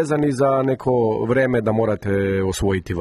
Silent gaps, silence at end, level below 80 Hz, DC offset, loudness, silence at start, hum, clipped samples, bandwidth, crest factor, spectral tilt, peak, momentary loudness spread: none; 0 s; -42 dBFS; under 0.1%; -20 LUFS; 0 s; none; under 0.1%; 12.5 kHz; 12 dB; -7 dB/octave; -6 dBFS; 3 LU